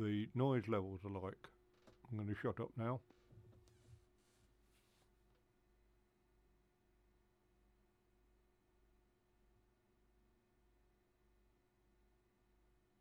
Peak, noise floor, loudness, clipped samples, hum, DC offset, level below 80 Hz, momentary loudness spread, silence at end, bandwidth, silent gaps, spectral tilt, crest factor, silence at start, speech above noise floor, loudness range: -26 dBFS; -77 dBFS; -43 LUFS; under 0.1%; none; under 0.1%; -76 dBFS; 13 LU; 9.05 s; 9.8 kHz; none; -9 dB/octave; 24 dB; 0 s; 35 dB; 9 LU